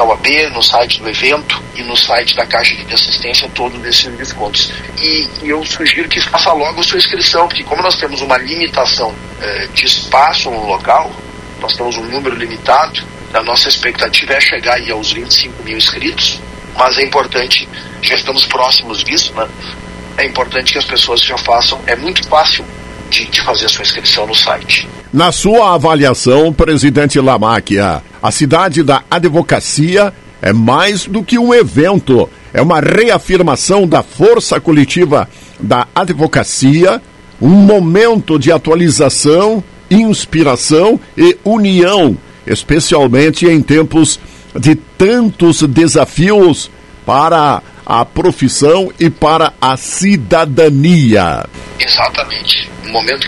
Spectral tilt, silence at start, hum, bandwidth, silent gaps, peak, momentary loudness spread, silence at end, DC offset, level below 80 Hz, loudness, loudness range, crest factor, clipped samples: -4 dB/octave; 0 s; none; over 20 kHz; none; 0 dBFS; 9 LU; 0 s; under 0.1%; -34 dBFS; -10 LUFS; 3 LU; 10 dB; 0.8%